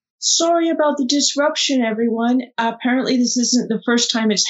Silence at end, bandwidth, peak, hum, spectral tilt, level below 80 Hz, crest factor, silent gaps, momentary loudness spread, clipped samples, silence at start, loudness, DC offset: 0 s; 8 kHz; 0 dBFS; none; -2.5 dB/octave; -82 dBFS; 16 dB; none; 4 LU; under 0.1%; 0.2 s; -17 LUFS; under 0.1%